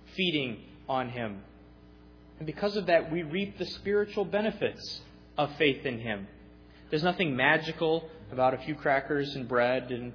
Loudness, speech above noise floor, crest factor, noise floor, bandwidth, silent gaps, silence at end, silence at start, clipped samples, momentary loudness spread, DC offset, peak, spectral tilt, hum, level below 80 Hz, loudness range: -30 LUFS; 24 dB; 22 dB; -53 dBFS; 5.4 kHz; none; 0 s; 0 s; under 0.1%; 13 LU; under 0.1%; -8 dBFS; -6.5 dB/octave; none; -58 dBFS; 4 LU